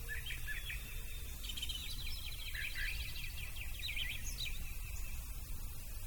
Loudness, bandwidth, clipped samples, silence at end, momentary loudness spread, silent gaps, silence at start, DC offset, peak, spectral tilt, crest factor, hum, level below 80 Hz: -43 LUFS; 19 kHz; under 0.1%; 0 s; 7 LU; none; 0 s; under 0.1%; -28 dBFS; -1.5 dB/octave; 14 dB; none; -44 dBFS